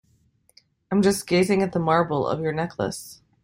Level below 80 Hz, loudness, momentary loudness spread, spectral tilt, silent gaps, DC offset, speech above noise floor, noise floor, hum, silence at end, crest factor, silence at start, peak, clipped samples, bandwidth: -56 dBFS; -23 LUFS; 9 LU; -5.5 dB/octave; none; under 0.1%; 41 dB; -63 dBFS; none; 0.3 s; 18 dB; 0.9 s; -6 dBFS; under 0.1%; 16.5 kHz